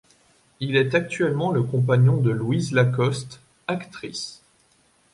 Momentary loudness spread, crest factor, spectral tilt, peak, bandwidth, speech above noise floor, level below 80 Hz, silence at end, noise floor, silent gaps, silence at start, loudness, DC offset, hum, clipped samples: 14 LU; 18 dB; -6.5 dB/octave; -6 dBFS; 11.5 kHz; 40 dB; -60 dBFS; 0.8 s; -61 dBFS; none; 0.6 s; -23 LUFS; under 0.1%; none; under 0.1%